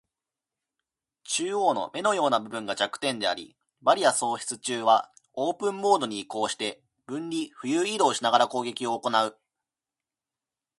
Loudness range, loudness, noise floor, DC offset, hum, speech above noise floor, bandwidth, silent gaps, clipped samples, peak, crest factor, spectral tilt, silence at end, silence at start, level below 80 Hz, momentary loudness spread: 2 LU; -26 LUFS; under -90 dBFS; under 0.1%; none; over 64 dB; 11.5 kHz; none; under 0.1%; -4 dBFS; 22 dB; -2.5 dB/octave; 1.45 s; 1.25 s; -76 dBFS; 9 LU